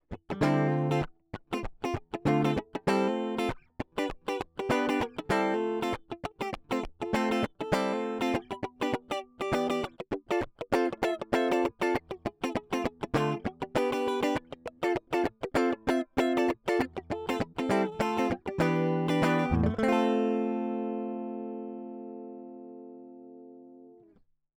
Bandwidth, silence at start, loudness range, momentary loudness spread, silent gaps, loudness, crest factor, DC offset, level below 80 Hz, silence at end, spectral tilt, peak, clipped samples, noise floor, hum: over 20 kHz; 0.1 s; 4 LU; 13 LU; none; -30 LUFS; 20 dB; under 0.1%; -54 dBFS; 0.65 s; -6.5 dB/octave; -10 dBFS; under 0.1%; -64 dBFS; none